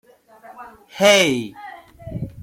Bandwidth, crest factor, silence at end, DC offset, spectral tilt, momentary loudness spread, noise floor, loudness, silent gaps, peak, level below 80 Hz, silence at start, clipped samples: 16.5 kHz; 20 dB; 0 s; under 0.1%; -3 dB/octave; 26 LU; -46 dBFS; -16 LUFS; none; -2 dBFS; -50 dBFS; 0.5 s; under 0.1%